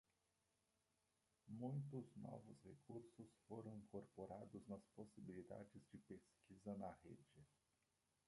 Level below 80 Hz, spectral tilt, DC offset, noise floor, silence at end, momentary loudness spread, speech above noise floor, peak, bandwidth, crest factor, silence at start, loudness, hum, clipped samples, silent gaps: -84 dBFS; -8.5 dB/octave; under 0.1%; -88 dBFS; 0.8 s; 13 LU; 31 dB; -38 dBFS; 11.5 kHz; 20 dB; 1.45 s; -58 LUFS; none; under 0.1%; none